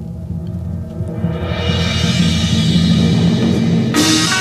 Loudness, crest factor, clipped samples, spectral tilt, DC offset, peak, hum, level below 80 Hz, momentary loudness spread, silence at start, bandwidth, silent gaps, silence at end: -15 LUFS; 14 dB; under 0.1%; -5 dB/octave; under 0.1%; 0 dBFS; none; -32 dBFS; 12 LU; 0 s; 14.5 kHz; none; 0 s